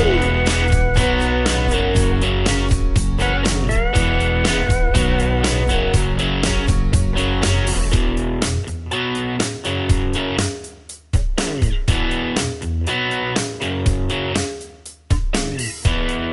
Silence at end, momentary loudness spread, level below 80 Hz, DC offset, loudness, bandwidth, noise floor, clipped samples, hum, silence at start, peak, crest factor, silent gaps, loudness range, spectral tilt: 0 s; 6 LU; -20 dBFS; under 0.1%; -19 LUFS; 11.5 kHz; -39 dBFS; under 0.1%; none; 0 s; -2 dBFS; 14 dB; none; 4 LU; -4.5 dB/octave